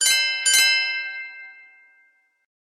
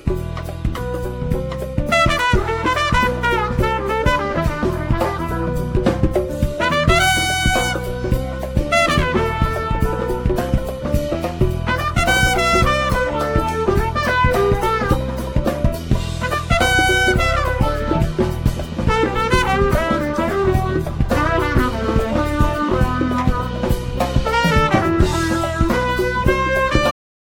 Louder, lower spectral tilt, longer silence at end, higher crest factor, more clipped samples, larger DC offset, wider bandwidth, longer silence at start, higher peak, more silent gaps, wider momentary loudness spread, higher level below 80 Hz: about the same, -18 LUFS vs -18 LUFS; second, 6 dB/octave vs -5.5 dB/octave; first, 1.1 s vs 0.35 s; about the same, 20 dB vs 16 dB; neither; neither; second, 15.5 kHz vs over 20 kHz; about the same, 0 s vs 0.05 s; second, -4 dBFS vs 0 dBFS; neither; first, 20 LU vs 7 LU; second, under -90 dBFS vs -24 dBFS